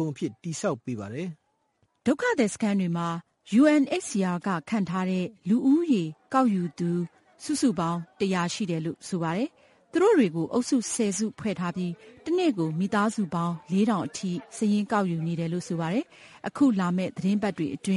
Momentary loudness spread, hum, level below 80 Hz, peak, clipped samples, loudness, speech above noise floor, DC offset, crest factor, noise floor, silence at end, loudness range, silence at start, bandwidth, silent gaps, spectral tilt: 11 LU; none; -68 dBFS; -10 dBFS; under 0.1%; -27 LUFS; 45 dB; under 0.1%; 16 dB; -71 dBFS; 0 s; 3 LU; 0 s; 11.5 kHz; none; -6 dB/octave